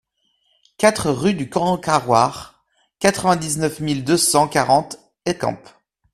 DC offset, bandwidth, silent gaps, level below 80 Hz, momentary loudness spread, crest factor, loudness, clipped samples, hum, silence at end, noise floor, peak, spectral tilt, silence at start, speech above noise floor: under 0.1%; 14.5 kHz; none; -52 dBFS; 10 LU; 20 dB; -19 LUFS; under 0.1%; none; 0.55 s; -66 dBFS; 0 dBFS; -4 dB/octave; 0.8 s; 48 dB